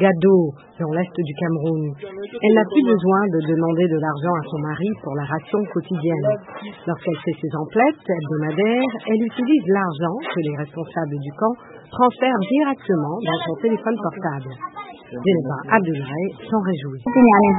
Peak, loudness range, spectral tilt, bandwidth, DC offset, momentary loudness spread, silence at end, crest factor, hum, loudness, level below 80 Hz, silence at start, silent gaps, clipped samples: 0 dBFS; 4 LU; -12 dB/octave; 4 kHz; under 0.1%; 11 LU; 0 s; 20 dB; none; -20 LUFS; -60 dBFS; 0 s; none; under 0.1%